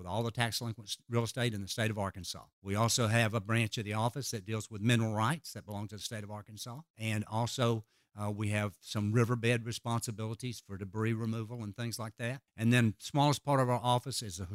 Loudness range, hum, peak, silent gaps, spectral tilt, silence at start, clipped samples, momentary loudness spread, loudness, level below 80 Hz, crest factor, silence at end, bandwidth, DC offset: 4 LU; none; -12 dBFS; 2.53-2.62 s, 6.90-6.94 s; -5 dB/octave; 0 s; under 0.1%; 12 LU; -34 LUFS; -68 dBFS; 22 dB; 0 s; 16 kHz; under 0.1%